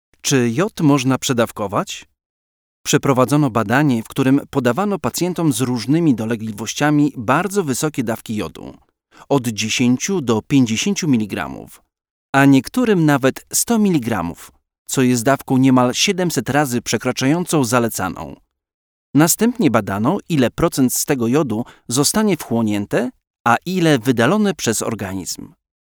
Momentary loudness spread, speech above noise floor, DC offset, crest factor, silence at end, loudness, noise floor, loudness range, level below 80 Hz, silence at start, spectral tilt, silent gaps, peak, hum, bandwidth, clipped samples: 9 LU; over 73 dB; under 0.1%; 18 dB; 0.5 s; -17 LUFS; under -90 dBFS; 2 LU; -50 dBFS; 0.25 s; -5 dB/octave; 2.26-2.84 s, 12.11-12.33 s, 14.78-14.85 s, 18.74-19.14 s, 23.30-23.34 s, 23.40-23.45 s; 0 dBFS; none; over 20 kHz; under 0.1%